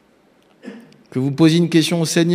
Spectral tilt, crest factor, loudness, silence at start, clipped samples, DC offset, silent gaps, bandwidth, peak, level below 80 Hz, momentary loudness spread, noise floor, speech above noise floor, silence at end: -5.5 dB/octave; 18 dB; -16 LUFS; 0.65 s; under 0.1%; under 0.1%; none; 16 kHz; 0 dBFS; -64 dBFS; 24 LU; -55 dBFS; 40 dB; 0 s